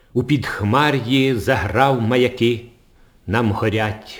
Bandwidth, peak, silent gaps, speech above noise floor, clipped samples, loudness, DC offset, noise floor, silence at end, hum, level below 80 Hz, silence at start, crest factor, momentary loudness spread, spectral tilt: over 20 kHz; 0 dBFS; none; 33 dB; under 0.1%; -18 LUFS; under 0.1%; -51 dBFS; 0 s; none; -46 dBFS; 0.15 s; 18 dB; 5 LU; -6.5 dB/octave